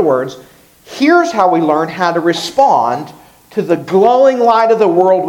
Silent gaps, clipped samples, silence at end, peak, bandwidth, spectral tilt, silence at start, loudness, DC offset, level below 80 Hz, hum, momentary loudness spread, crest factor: none; 0.1%; 0 s; 0 dBFS; 16.5 kHz; -5.5 dB/octave; 0 s; -12 LUFS; under 0.1%; -58 dBFS; none; 13 LU; 12 dB